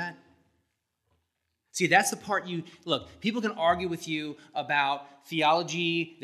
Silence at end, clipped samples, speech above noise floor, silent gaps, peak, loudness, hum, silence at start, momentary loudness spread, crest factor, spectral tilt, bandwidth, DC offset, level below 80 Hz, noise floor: 0.1 s; under 0.1%; 51 dB; none; -6 dBFS; -28 LUFS; none; 0 s; 13 LU; 24 dB; -3.5 dB/octave; 14.5 kHz; under 0.1%; -68 dBFS; -80 dBFS